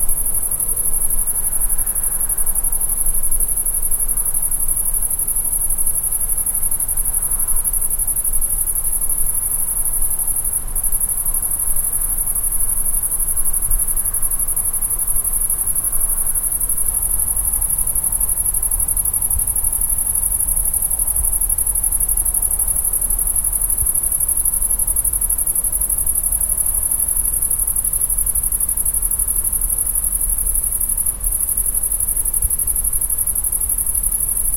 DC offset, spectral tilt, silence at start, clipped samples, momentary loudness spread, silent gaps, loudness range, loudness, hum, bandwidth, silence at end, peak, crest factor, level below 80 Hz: under 0.1%; -2 dB/octave; 0 s; under 0.1%; 2 LU; none; 2 LU; -16 LUFS; none; 17 kHz; 0 s; 0 dBFS; 16 dB; -26 dBFS